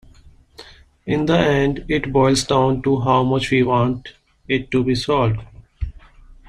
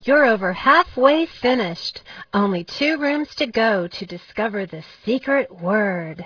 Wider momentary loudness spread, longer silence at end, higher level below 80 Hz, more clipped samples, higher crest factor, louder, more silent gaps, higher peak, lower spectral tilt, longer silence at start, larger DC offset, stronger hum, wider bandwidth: about the same, 14 LU vs 14 LU; first, 0.6 s vs 0 s; first, -38 dBFS vs -54 dBFS; neither; about the same, 18 dB vs 18 dB; about the same, -18 LUFS vs -20 LUFS; neither; about the same, -2 dBFS vs -2 dBFS; about the same, -6 dB/octave vs -6 dB/octave; first, 0.6 s vs 0 s; neither; neither; first, 12.5 kHz vs 5.4 kHz